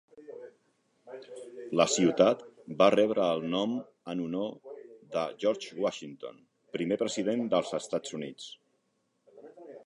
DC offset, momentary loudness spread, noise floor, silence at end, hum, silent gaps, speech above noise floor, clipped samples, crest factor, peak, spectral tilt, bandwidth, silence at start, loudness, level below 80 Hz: under 0.1%; 23 LU; -76 dBFS; 0.05 s; none; none; 47 dB; under 0.1%; 24 dB; -8 dBFS; -4.5 dB/octave; 11 kHz; 0.15 s; -29 LUFS; -72 dBFS